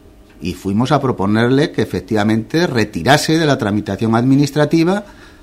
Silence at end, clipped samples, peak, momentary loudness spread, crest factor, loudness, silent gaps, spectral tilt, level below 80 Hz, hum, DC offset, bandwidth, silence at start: 0.3 s; under 0.1%; 0 dBFS; 7 LU; 16 dB; -15 LUFS; none; -6 dB/octave; -44 dBFS; none; under 0.1%; 16 kHz; 0.4 s